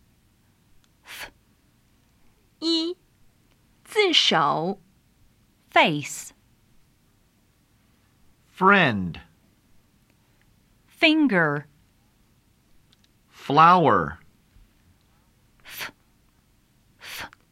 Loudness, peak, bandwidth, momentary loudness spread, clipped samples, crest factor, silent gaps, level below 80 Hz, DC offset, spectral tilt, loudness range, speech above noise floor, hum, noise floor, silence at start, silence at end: -21 LUFS; -4 dBFS; 16 kHz; 24 LU; under 0.1%; 22 dB; none; -60 dBFS; under 0.1%; -4.5 dB/octave; 10 LU; 43 dB; none; -63 dBFS; 1.1 s; 0.25 s